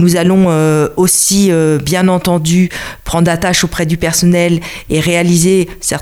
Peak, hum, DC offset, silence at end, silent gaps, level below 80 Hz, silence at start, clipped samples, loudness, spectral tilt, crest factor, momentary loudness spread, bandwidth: 0 dBFS; none; under 0.1%; 0 s; none; -34 dBFS; 0 s; under 0.1%; -11 LUFS; -4.5 dB/octave; 10 dB; 6 LU; 16.5 kHz